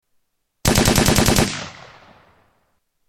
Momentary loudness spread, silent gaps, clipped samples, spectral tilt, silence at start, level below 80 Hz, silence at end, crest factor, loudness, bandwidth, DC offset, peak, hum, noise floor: 13 LU; none; under 0.1%; -4 dB/octave; 0.65 s; -32 dBFS; 1.35 s; 18 dB; -16 LUFS; 18 kHz; under 0.1%; -2 dBFS; none; -68 dBFS